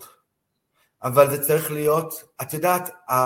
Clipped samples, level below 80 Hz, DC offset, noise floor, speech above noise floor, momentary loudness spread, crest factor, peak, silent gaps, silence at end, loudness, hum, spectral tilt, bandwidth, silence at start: under 0.1%; -66 dBFS; under 0.1%; -76 dBFS; 55 dB; 14 LU; 22 dB; -2 dBFS; none; 0 s; -21 LUFS; none; -5 dB/octave; 17 kHz; 0 s